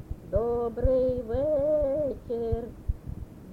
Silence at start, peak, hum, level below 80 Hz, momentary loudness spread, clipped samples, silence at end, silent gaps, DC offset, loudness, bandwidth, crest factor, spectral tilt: 0 s; -12 dBFS; none; -38 dBFS; 12 LU; under 0.1%; 0 s; none; under 0.1%; -28 LUFS; 5.4 kHz; 16 dB; -10 dB/octave